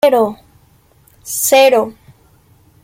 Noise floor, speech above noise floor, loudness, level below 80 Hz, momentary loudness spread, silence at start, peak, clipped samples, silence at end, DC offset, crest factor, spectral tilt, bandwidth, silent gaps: -51 dBFS; 39 dB; -13 LUFS; -56 dBFS; 15 LU; 0.05 s; -2 dBFS; under 0.1%; 0.9 s; under 0.1%; 14 dB; -2 dB/octave; 17 kHz; none